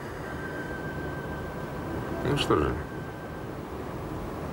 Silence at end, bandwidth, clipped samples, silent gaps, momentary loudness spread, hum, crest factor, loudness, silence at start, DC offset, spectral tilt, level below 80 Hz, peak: 0 s; 16 kHz; under 0.1%; none; 12 LU; none; 22 dB; -32 LUFS; 0 s; under 0.1%; -6 dB/octave; -44 dBFS; -10 dBFS